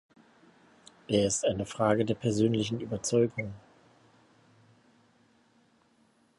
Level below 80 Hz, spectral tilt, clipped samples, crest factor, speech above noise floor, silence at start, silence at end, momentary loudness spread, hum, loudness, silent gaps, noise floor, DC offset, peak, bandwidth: -60 dBFS; -5 dB/octave; under 0.1%; 20 dB; 39 dB; 1.1 s; 2.8 s; 12 LU; none; -29 LUFS; none; -67 dBFS; under 0.1%; -12 dBFS; 11.5 kHz